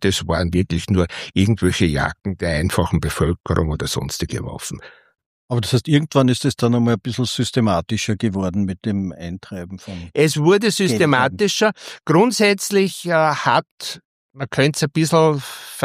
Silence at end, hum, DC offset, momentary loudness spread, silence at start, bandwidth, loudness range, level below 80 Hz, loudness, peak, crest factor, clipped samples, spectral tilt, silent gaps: 0 s; none; under 0.1%; 14 LU; 0 s; 15.5 kHz; 5 LU; -38 dBFS; -19 LUFS; -2 dBFS; 18 dB; under 0.1%; -5 dB/octave; 3.40-3.44 s, 5.26-5.49 s, 13.71-13.78 s, 14.05-14.29 s